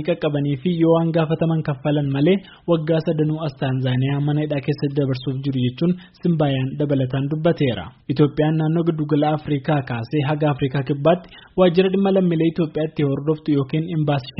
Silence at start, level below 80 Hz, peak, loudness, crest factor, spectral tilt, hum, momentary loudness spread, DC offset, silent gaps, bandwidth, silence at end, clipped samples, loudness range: 0 s; -52 dBFS; -4 dBFS; -20 LUFS; 16 dB; -7 dB/octave; none; 5 LU; under 0.1%; none; 5.8 kHz; 0.1 s; under 0.1%; 2 LU